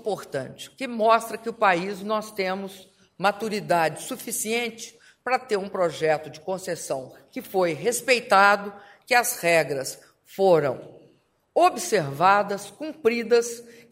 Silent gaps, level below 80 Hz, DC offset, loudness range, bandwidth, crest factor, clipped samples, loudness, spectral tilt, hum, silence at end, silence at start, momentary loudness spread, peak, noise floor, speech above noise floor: none; -70 dBFS; under 0.1%; 5 LU; 16 kHz; 22 dB; under 0.1%; -24 LUFS; -3.5 dB/octave; none; 0.2 s; 0.05 s; 15 LU; -4 dBFS; -61 dBFS; 37 dB